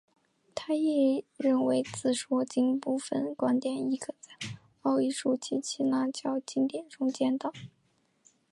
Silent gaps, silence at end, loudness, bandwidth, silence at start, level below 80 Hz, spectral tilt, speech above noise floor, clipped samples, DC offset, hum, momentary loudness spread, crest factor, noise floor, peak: none; 0.85 s; -30 LUFS; 11.5 kHz; 0.55 s; -76 dBFS; -4.5 dB/octave; 42 dB; under 0.1%; under 0.1%; none; 13 LU; 14 dB; -72 dBFS; -16 dBFS